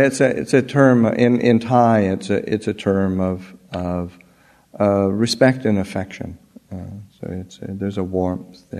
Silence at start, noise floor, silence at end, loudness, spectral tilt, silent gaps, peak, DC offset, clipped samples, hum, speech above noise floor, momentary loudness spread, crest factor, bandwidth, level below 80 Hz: 0 s; -53 dBFS; 0 s; -18 LUFS; -6.5 dB/octave; none; 0 dBFS; under 0.1%; under 0.1%; none; 35 dB; 19 LU; 18 dB; 13.5 kHz; -52 dBFS